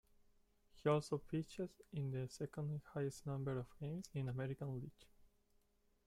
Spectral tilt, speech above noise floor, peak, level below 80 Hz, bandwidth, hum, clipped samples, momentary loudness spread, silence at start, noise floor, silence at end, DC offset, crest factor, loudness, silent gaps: -7 dB/octave; 34 dB; -24 dBFS; -70 dBFS; 13.5 kHz; none; under 0.1%; 9 LU; 0.75 s; -78 dBFS; 0.8 s; under 0.1%; 20 dB; -45 LUFS; none